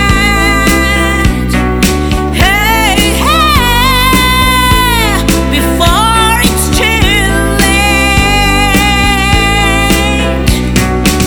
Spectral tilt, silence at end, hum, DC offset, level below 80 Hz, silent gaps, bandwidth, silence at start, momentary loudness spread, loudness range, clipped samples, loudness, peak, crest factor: -4 dB/octave; 0 s; none; under 0.1%; -14 dBFS; none; over 20 kHz; 0 s; 4 LU; 1 LU; 1%; -8 LUFS; 0 dBFS; 8 dB